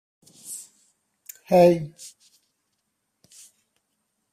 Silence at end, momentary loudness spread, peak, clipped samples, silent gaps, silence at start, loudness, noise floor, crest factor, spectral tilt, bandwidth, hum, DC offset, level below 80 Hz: 2.25 s; 27 LU; -6 dBFS; under 0.1%; none; 0.5 s; -19 LUFS; -76 dBFS; 22 dB; -6.5 dB/octave; 15.5 kHz; none; under 0.1%; -66 dBFS